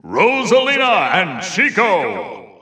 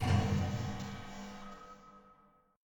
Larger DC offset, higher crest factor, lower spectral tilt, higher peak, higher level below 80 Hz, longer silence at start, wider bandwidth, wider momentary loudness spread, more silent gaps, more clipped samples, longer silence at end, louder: neither; about the same, 16 dB vs 18 dB; second, -3.5 dB/octave vs -6.5 dB/octave; first, 0 dBFS vs -18 dBFS; second, -70 dBFS vs -52 dBFS; about the same, 0.05 s vs 0 s; second, 9.8 kHz vs 17.5 kHz; second, 10 LU vs 23 LU; neither; neither; second, 0.15 s vs 0.65 s; first, -14 LUFS vs -37 LUFS